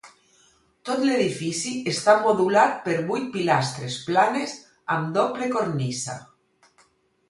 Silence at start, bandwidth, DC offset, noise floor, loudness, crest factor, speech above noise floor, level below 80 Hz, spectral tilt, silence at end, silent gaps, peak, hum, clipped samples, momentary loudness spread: 0.05 s; 11.5 kHz; under 0.1%; -62 dBFS; -23 LUFS; 20 dB; 40 dB; -66 dBFS; -4.5 dB/octave; 1.05 s; none; -4 dBFS; none; under 0.1%; 12 LU